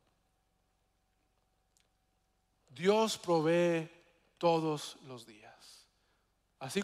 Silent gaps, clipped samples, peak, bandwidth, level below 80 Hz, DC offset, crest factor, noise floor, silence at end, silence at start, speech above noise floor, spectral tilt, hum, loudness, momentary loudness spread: none; under 0.1%; -16 dBFS; 15 kHz; -78 dBFS; under 0.1%; 20 dB; -77 dBFS; 0 s; 2.75 s; 45 dB; -5 dB/octave; none; -32 LUFS; 20 LU